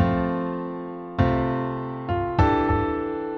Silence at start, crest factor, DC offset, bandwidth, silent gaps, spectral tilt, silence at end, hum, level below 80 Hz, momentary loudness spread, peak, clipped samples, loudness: 0 s; 18 dB; under 0.1%; 6.6 kHz; none; -9 dB/octave; 0 s; none; -36 dBFS; 10 LU; -6 dBFS; under 0.1%; -25 LUFS